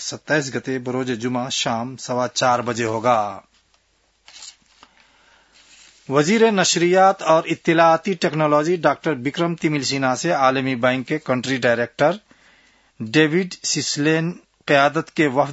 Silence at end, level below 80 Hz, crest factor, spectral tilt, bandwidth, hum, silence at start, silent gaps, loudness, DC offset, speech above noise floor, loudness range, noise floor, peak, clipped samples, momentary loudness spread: 0 s; -64 dBFS; 18 dB; -4 dB/octave; 8 kHz; none; 0 s; none; -19 LUFS; under 0.1%; 44 dB; 7 LU; -63 dBFS; -2 dBFS; under 0.1%; 10 LU